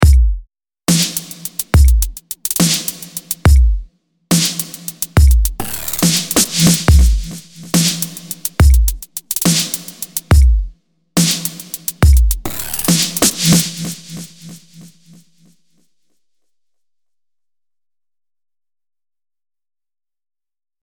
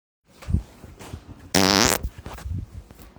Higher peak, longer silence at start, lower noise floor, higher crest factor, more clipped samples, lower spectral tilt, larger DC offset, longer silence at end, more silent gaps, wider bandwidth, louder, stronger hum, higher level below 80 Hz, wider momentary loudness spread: about the same, 0 dBFS vs 0 dBFS; second, 0 s vs 0.4 s; first, under -90 dBFS vs -43 dBFS; second, 14 dB vs 26 dB; neither; about the same, -4 dB/octave vs -3 dB/octave; neither; first, 6 s vs 0.1 s; neither; about the same, 19.5 kHz vs over 20 kHz; first, -15 LUFS vs -22 LUFS; neither; first, -18 dBFS vs -38 dBFS; second, 13 LU vs 25 LU